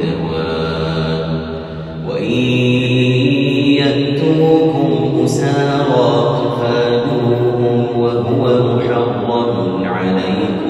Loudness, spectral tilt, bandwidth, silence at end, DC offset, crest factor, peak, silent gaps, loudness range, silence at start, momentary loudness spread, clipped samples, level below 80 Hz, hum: -15 LUFS; -7 dB/octave; 12 kHz; 0 s; under 0.1%; 14 dB; 0 dBFS; none; 2 LU; 0 s; 6 LU; under 0.1%; -42 dBFS; none